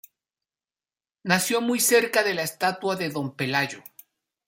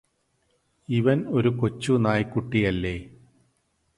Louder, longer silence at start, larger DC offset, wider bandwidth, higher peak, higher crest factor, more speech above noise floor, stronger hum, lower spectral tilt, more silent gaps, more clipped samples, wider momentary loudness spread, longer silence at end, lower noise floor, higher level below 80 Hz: about the same, -23 LUFS vs -24 LUFS; first, 1.25 s vs 0.9 s; neither; first, 16.5 kHz vs 11.5 kHz; about the same, -4 dBFS vs -6 dBFS; about the same, 22 dB vs 20 dB; first, over 66 dB vs 47 dB; neither; second, -3 dB/octave vs -7.5 dB/octave; neither; neither; first, 10 LU vs 7 LU; second, 0.65 s vs 0.9 s; first, under -90 dBFS vs -70 dBFS; second, -72 dBFS vs -48 dBFS